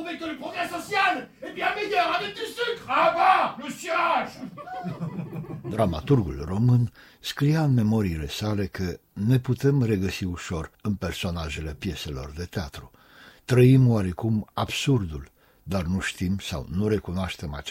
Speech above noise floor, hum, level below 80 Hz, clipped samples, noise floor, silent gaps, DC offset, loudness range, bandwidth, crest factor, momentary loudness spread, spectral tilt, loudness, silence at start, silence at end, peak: 27 dB; none; -44 dBFS; under 0.1%; -52 dBFS; none; under 0.1%; 4 LU; 16 kHz; 20 dB; 14 LU; -6.5 dB/octave; -25 LUFS; 0 s; 0 s; -6 dBFS